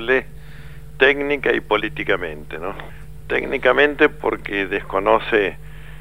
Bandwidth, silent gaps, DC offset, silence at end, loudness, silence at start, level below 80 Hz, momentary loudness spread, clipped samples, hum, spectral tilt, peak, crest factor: 16 kHz; none; 1%; 0 s; -19 LUFS; 0 s; -40 dBFS; 23 LU; under 0.1%; none; -6 dB/octave; 0 dBFS; 20 dB